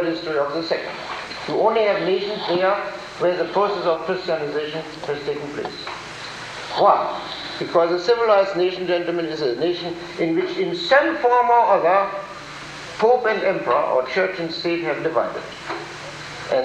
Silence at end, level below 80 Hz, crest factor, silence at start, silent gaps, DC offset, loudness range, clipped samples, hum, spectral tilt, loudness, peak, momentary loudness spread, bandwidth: 0 s; -58 dBFS; 20 dB; 0 s; none; under 0.1%; 5 LU; under 0.1%; none; -5 dB/octave; -21 LUFS; -2 dBFS; 14 LU; 10 kHz